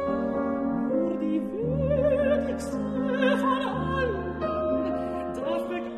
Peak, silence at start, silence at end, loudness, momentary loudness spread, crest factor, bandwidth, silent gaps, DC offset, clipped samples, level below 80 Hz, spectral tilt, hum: -12 dBFS; 0 s; 0 s; -27 LUFS; 7 LU; 14 dB; 12.5 kHz; none; under 0.1%; under 0.1%; -46 dBFS; -7 dB/octave; none